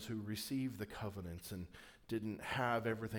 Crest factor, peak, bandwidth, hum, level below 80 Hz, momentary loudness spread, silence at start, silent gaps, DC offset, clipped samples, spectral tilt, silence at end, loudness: 18 dB; -24 dBFS; over 20 kHz; none; -66 dBFS; 12 LU; 0 s; none; under 0.1%; under 0.1%; -5.5 dB/octave; 0 s; -42 LUFS